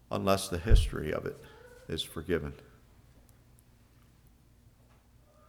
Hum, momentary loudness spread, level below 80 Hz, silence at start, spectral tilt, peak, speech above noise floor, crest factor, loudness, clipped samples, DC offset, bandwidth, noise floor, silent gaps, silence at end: 60 Hz at -65 dBFS; 22 LU; -36 dBFS; 0.1 s; -5.5 dB/octave; -8 dBFS; 32 dB; 26 dB; -32 LUFS; under 0.1%; under 0.1%; 16 kHz; -61 dBFS; none; 2.95 s